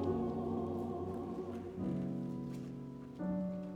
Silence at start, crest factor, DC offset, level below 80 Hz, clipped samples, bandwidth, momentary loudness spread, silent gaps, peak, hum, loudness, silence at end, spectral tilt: 0 s; 14 dB; under 0.1%; -62 dBFS; under 0.1%; 10.5 kHz; 7 LU; none; -26 dBFS; none; -41 LUFS; 0 s; -9.5 dB/octave